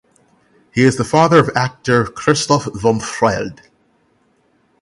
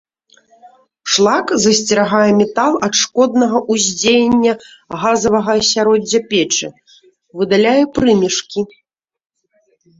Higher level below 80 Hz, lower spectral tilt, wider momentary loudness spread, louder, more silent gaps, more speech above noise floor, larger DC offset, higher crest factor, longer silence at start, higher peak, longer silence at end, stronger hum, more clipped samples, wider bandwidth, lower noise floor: about the same, -46 dBFS vs -50 dBFS; first, -5 dB/octave vs -3 dB/octave; about the same, 8 LU vs 10 LU; about the same, -15 LUFS vs -14 LUFS; neither; about the same, 44 dB vs 47 dB; neither; about the same, 16 dB vs 14 dB; second, 0.75 s vs 1.05 s; about the same, 0 dBFS vs 0 dBFS; about the same, 1.3 s vs 1.35 s; neither; neither; first, 11.5 kHz vs 8 kHz; about the same, -59 dBFS vs -60 dBFS